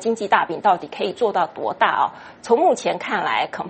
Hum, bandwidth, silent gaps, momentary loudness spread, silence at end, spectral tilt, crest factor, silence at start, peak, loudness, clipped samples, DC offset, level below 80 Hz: none; 8.8 kHz; none; 6 LU; 0 s; -4 dB/octave; 20 dB; 0 s; 0 dBFS; -20 LUFS; under 0.1%; under 0.1%; -68 dBFS